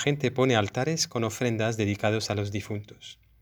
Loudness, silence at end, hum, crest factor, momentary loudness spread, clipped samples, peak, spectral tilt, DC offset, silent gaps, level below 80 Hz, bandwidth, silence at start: -27 LUFS; 0.3 s; none; 20 dB; 13 LU; under 0.1%; -6 dBFS; -5 dB/octave; under 0.1%; none; -62 dBFS; over 20 kHz; 0 s